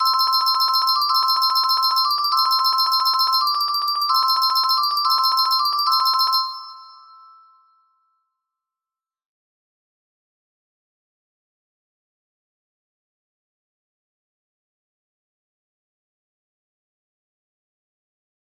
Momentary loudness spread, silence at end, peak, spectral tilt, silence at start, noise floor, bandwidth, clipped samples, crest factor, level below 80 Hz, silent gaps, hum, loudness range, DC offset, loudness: 3 LU; 11.65 s; -6 dBFS; 3.5 dB/octave; 0 s; under -90 dBFS; 15.5 kHz; under 0.1%; 16 dB; -80 dBFS; none; none; 6 LU; under 0.1%; -17 LUFS